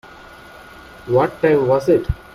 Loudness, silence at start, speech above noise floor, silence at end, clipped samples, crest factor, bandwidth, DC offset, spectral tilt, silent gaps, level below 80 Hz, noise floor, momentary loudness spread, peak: -17 LUFS; 1.05 s; 25 dB; 0.2 s; under 0.1%; 16 dB; 13.5 kHz; under 0.1%; -8 dB/octave; none; -36 dBFS; -40 dBFS; 4 LU; -2 dBFS